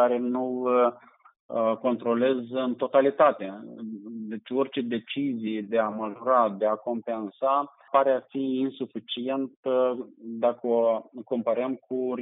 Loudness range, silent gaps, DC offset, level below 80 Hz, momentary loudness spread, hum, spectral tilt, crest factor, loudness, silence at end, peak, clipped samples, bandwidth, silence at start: 2 LU; 1.39-1.49 s, 9.57-9.63 s; under 0.1%; -84 dBFS; 12 LU; none; -4 dB/octave; 18 dB; -27 LUFS; 0 s; -8 dBFS; under 0.1%; 4 kHz; 0 s